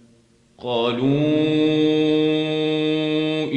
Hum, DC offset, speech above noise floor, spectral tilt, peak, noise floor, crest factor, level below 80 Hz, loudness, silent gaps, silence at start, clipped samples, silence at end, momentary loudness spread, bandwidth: none; under 0.1%; 37 dB; -7 dB/octave; -8 dBFS; -56 dBFS; 12 dB; -64 dBFS; -20 LUFS; none; 0.6 s; under 0.1%; 0 s; 4 LU; 8.4 kHz